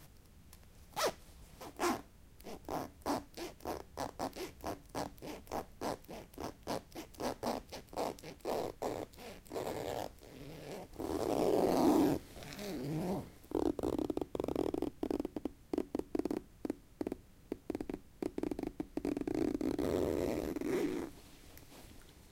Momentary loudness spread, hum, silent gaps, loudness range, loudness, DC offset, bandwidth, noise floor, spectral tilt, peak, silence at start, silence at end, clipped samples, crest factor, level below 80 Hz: 16 LU; none; none; 8 LU; -39 LUFS; under 0.1%; 17 kHz; -58 dBFS; -5.5 dB/octave; -18 dBFS; 0 s; 0.05 s; under 0.1%; 20 dB; -58 dBFS